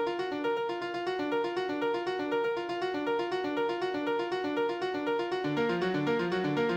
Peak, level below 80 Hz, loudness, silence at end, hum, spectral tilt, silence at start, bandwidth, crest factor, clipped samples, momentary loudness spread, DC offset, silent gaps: -16 dBFS; -68 dBFS; -31 LUFS; 0 s; none; -6 dB/octave; 0 s; 16 kHz; 16 dB; under 0.1%; 3 LU; under 0.1%; none